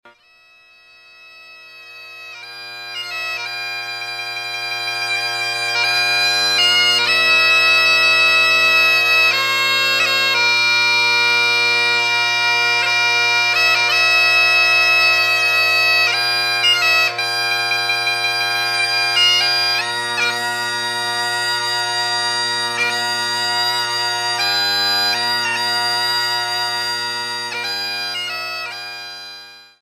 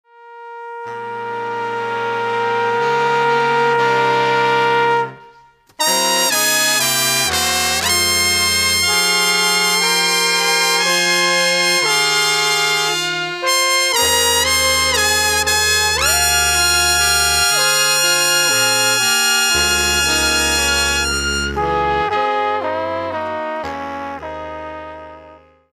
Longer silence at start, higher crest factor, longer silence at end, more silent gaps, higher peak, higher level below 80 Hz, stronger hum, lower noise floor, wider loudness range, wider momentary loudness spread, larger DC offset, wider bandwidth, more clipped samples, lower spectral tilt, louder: first, 1.25 s vs 0.2 s; about the same, 14 dB vs 16 dB; second, 0.2 s vs 0.4 s; neither; about the same, -2 dBFS vs 0 dBFS; second, -66 dBFS vs -38 dBFS; neither; about the same, -51 dBFS vs -48 dBFS; first, 11 LU vs 7 LU; about the same, 12 LU vs 12 LU; neither; second, 14 kHz vs 16 kHz; neither; about the same, 0 dB/octave vs -0.5 dB/octave; about the same, -14 LUFS vs -14 LUFS